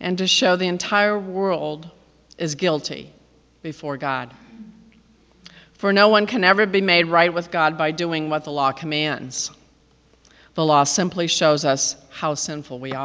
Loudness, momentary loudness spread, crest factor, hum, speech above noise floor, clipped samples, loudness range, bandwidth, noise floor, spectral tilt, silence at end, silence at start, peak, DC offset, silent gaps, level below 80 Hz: -20 LUFS; 14 LU; 22 dB; none; 36 dB; under 0.1%; 10 LU; 8 kHz; -57 dBFS; -3.5 dB/octave; 0 s; 0 s; 0 dBFS; under 0.1%; none; -62 dBFS